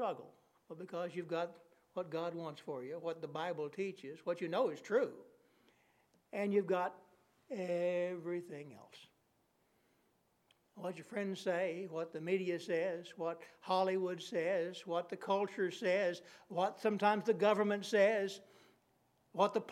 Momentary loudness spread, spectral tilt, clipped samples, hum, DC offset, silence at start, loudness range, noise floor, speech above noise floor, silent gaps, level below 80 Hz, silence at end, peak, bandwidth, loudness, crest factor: 14 LU; -5.5 dB/octave; under 0.1%; none; under 0.1%; 0 s; 9 LU; -77 dBFS; 39 dB; none; under -90 dBFS; 0 s; -18 dBFS; 14.5 kHz; -38 LUFS; 22 dB